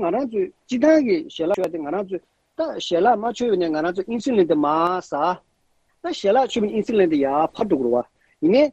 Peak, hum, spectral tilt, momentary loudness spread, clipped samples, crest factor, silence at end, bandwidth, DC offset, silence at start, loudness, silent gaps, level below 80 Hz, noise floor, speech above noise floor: -4 dBFS; none; -6 dB/octave; 10 LU; under 0.1%; 16 dB; 0 s; 8.6 kHz; under 0.1%; 0 s; -21 LUFS; none; -60 dBFS; -65 dBFS; 45 dB